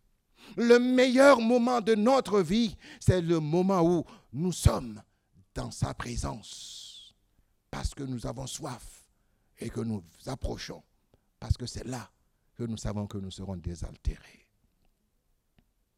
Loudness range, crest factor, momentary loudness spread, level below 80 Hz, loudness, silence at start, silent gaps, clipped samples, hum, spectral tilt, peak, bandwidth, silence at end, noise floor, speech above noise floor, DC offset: 15 LU; 22 dB; 20 LU; -44 dBFS; -28 LUFS; 0.45 s; none; under 0.1%; none; -6 dB/octave; -6 dBFS; 15.5 kHz; 1.8 s; -73 dBFS; 45 dB; under 0.1%